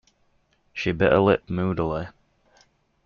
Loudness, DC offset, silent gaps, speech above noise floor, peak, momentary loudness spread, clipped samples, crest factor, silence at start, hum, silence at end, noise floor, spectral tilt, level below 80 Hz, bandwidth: -23 LUFS; under 0.1%; none; 44 dB; -6 dBFS; 16 LU; under 0.1%; 20 dB; 0.75 s; none; 0.95 s; -66 dBFS; -5.5 dB/octave; -50 dBFS; 7 kHz